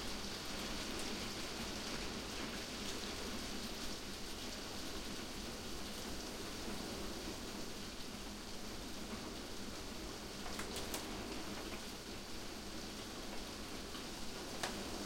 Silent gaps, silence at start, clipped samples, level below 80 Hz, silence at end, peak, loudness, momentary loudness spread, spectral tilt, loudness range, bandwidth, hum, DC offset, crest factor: none; 0 s; under 0.1%; -56 dBFS; 0 s; -26 dBFS; -45 LUFS; 4 LU; -3 dB/octave; 3 LU; 16.5 kHz; none; under 0.1%; 20 dB